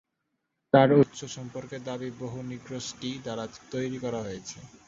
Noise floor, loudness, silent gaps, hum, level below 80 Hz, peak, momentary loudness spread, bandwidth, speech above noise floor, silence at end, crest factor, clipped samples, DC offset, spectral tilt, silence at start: -80 dBFS; -28 LUFS; none; none; -64 dBFS; -6 dBFS; 17 LU; 7.8 kHz; 52 dB; 0.2 s; 24 dB; under 0.1%; under 0.1%; -6 dB/octave; 0.75 s